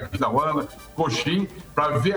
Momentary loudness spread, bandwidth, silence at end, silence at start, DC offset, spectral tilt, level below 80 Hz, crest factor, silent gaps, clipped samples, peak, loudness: 6 LU; over 20 kHz; 0 s; 0 s; under 0.1%; -5.5 dB/octave; -48 dBFS; 16 dB; none; under 0.1%; -8 dBFS; -24 LUFS